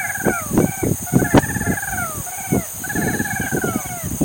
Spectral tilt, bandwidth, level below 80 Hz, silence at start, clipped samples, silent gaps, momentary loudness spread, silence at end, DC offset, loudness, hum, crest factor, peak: -5 dB/octave; 17 kHz; -38 dBFS; 0 s; under 0.1%; none; 8 LU; 0 s; under 0.1%; -20 LUFS; none; 20 dB; 0 dBFS